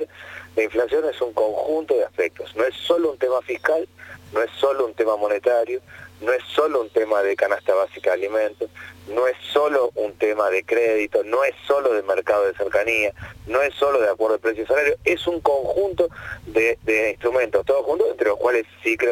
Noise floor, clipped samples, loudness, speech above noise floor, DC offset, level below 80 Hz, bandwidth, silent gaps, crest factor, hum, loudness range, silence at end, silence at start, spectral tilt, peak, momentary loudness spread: -40 dBFS; under 0.1%; -21 LUFS; 19 dB; under 0.1%; -54 dBFS; 16.5 kHz; none; 18 dB; none; 2 LU; 0 s; 0 s; -4.5 dB/octave; -4 dBFS; 6 LU